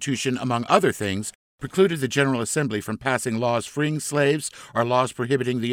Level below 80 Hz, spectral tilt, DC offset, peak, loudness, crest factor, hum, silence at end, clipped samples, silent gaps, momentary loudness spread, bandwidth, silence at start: -60 dBFS; -4.5 dB/octave; under 0.1%; -2 dBFS; -23 LUFS; 20 dB; none; 0 s; under 0.1%; 1.35-1.58 s; 7 LU; 19 kHz; 0 s